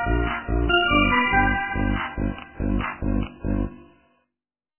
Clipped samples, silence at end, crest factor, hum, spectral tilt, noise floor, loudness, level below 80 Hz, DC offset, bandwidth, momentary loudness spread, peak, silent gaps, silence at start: under 0.1%; 0.95 s; 18 dB; none; -9.5 dB/octave; -87 dBFS; -23 LUFS; -30 dBFS; under 0.1%; 3.2 kHz; 11 LU; -6 dBFS; none; 0 s